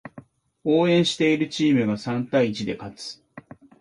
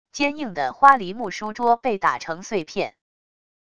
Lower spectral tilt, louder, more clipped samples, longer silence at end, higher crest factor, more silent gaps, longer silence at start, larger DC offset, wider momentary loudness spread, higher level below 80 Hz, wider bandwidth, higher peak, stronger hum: first, -5.5 dB/octave vs -4 dB/octave; about the same, -22 LUFS vs -21 LUFS; neither; second, 0.4 s vs 0.8 s; second, 16 dB vs 22 dB; neither; about the same, 0.05 s vs 0.15 s; second, under 0.1% vs 0.5%; first, 17 LU vs 14 LU; about the same, -62 dBFS vs -60 dBFS; first, 11.5 kHz vs 10 kHz; second, -8 dBFS vs 0 dBFS; neither